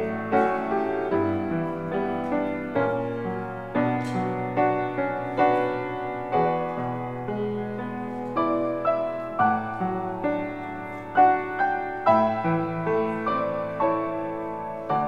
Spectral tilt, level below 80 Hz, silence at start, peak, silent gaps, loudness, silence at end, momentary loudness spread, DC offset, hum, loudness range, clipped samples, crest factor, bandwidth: -8.5 dB/octave; -58 dBFS; 0 s; -8 dBFS; none; -26 LUFS; 0 s; 9 LU; 0.3%; none; 3 LU; under 0.1%; 18 dB; 9.2 kHz